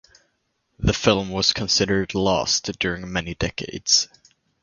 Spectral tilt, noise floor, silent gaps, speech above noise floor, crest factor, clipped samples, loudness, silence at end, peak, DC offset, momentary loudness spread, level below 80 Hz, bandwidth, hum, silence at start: -3 dB/octave; -72 dBFS; none; 50 dB; 24 dB; under 0.1%; -21 LUFS; 0.55 s; 0 dBFS; under 0.1%; 9 LU; -40 dBFS; 11 kHz; none; 0.8 s